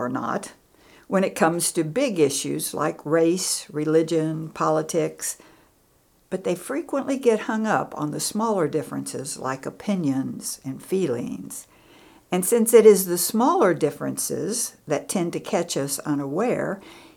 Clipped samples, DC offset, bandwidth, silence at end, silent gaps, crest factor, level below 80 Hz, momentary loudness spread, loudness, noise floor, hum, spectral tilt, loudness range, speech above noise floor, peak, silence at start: under 0.1%; under 0.1%; 19.5 kHz; 0.15 s; none; 22 dB; -66 dBFS; 11 LU; -23 LUFS; -61 dBFS; none; -4.5 dB/octave; 7 LU; 38 dB; -2 dBFS; 0 s